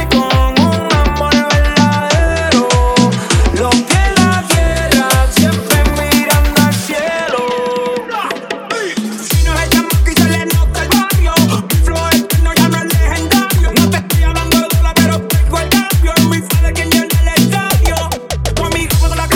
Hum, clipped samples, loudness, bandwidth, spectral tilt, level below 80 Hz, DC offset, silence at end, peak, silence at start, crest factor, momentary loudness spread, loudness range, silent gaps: none; under 0.1%; -12 LUFS; 18.5 kHz; -4.5 dB/octave; -16 dBFS; under 0.1%; 0 s; 0 dBFS; 0 s; 12 dB; 5 LU; 3 LU; none